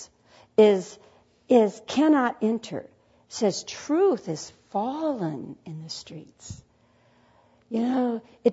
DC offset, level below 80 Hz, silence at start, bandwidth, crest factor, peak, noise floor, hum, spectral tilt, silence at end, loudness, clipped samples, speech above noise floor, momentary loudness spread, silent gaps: under 0.1%; -66 dBFS; 0 s; 8 kHz; 20 dB; -6 dBFS; -62 dBFS; none; -5.5 dB/octave; 0 s; -25 LUFS; under 0.1%; 37 dB; 21 LU; none